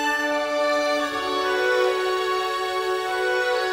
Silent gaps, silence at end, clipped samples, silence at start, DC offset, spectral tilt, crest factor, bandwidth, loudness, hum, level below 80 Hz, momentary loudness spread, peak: none; 0 s; under 0.1%; 0 s; under 0.1%; -2 dB/octave; 14 dB; 16.5 kHz; -23 LUFS; none; -60 dBFS; 4 LU; -10 dBFS